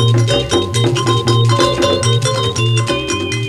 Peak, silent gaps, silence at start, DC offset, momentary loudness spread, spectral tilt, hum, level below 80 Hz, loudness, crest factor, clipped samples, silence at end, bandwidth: 0 dBFS; none; 0 s; under 0.1%; 3 LU; -5 dB/octave; none; -38 dBFS; -14 LUFS; 14 dB; under 0.1%; 0 s; 12 kHz